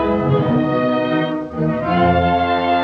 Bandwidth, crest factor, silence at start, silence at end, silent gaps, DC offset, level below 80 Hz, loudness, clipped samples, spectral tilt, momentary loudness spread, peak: 6.4 kHz; 12 dB; 0 s; 0 s; none; under 0.1%; -40 dBFS; -17 LUFS; under 0.1%; -9 dB/octave; 6 LU; -4 dBFS